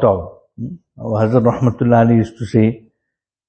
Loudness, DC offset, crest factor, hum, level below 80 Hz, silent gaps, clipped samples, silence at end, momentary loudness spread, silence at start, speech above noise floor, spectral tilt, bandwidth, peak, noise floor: -15 LUFS; under 0.1%; 16 dB; none; -46 dBFS; none; under 0.1%; 0.7 s; 18 LU; 0 s; 64 dB; -9.5 dB/octave; 8.4 kHz; 0 dBFS; -79 dBFS